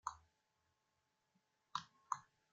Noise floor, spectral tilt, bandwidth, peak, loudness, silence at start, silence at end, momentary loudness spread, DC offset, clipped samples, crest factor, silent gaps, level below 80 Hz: -85 dBFS; -0.5 dB/octave; 9 kHz; -24 dBFS; -50 LUFS; 0.05 s; 0.3 s; 4 LU; under 0.1%; under 0.1%; 30 dB; none; -86 dBFS